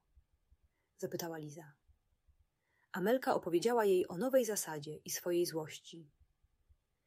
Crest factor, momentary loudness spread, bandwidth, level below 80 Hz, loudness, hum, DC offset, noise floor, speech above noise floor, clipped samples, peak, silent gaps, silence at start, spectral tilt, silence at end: 18 dB; 18 LU; 16 kHz; -76 dBFS; -35 LUFS; none; under 0.1%; -79 dBFS; 43 dB; under 0.1%; -20 dBFS; none; 1 s; -4.5 dB/octave; 1 s